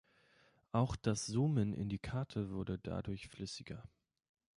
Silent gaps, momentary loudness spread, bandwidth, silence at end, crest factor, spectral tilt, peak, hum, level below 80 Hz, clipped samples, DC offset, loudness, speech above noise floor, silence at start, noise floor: none; 11 LU; 11.5 kHz; 0.7 s; 20 dB; -6 dB/octave; -20 dBFS; none; -58 dBFS; under 0.1%; under 0.1%; -39 LUFS; 33 dB; 0.75 s; -71 dBFS